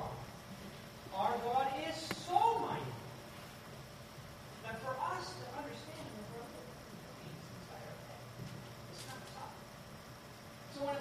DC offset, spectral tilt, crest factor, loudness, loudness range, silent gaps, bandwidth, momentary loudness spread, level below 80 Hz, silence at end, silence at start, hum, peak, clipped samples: under 0.1%; -4.5 dB/octave; 24 dB; -42 LUFS; 12 LU; none; 15.5 kHz; 16 LU; -66 dBFS; 0 s; 0 s; none; -18 dBFS; under 0.1%